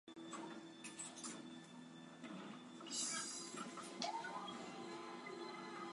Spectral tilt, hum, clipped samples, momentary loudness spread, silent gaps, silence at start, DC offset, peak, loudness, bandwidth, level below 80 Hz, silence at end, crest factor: -2 dB/octave; none; under 0.1%; 12 LU; none; 0.05 s; under 0.1%; -24 dBFS; -49 LUFS; 11.5 kHz; under -90 dBFS; 0 s; 26 dB